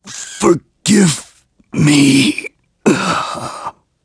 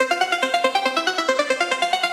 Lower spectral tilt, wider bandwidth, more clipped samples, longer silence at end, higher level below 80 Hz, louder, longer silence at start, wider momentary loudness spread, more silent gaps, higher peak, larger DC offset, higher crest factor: first, -4.5 dB/octave vs -0.5 dB/octave; second, 11 kHz vs 16 kHz; neither; first, 0.35 s vs 0 s; first, -50 dBFS vs -70 dBFS; first, -14 LUFS vs -20 LUFS; about the same, 0.05 s vs 0 s; first, 17 LU vs 1 LU; neither; first, 0 dBFS vs -4 dBFS; neither; about the same, 14 dB vs 18 dB